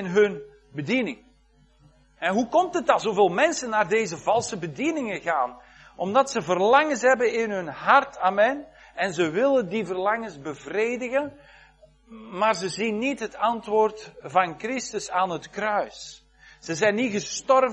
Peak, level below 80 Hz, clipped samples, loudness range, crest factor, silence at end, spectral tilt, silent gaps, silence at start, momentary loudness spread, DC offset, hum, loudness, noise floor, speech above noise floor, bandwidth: -4 dBFS; -62 dBFS; under 0.1%; 5 LU; 20 dB; 0 s; -4 dB/octave; none; 0 s; 13 LU; under 0.1%; none; -24 LUFS; -59 dBFS; 35 dB; 9.8 kHz